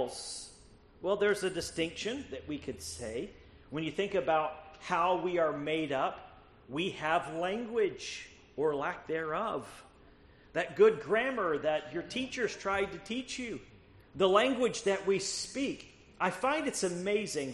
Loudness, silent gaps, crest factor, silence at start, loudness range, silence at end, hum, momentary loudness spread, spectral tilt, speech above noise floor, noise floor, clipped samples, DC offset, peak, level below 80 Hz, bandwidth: -33 LUFS; none; 22 dB; 0 s; 4 LU; 0 s; none; 12 LU; -4 dB/octave; 26 dB; -59 dBFS; under 0.1%; under 0.1%; -12 dBFS; -62 dBFS; 11.5 kHz